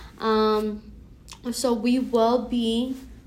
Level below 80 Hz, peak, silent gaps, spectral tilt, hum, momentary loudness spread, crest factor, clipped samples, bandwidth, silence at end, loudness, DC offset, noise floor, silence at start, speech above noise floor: -48 dBFS; -10 dBFS; none; -4.5 dB/octave; none; 11 LU; 14 dB; under 0.1%; 16 kHz; 0.05 s; -24 LUFS; under 0.1%; -45 dBFS; 0 s; 21 dB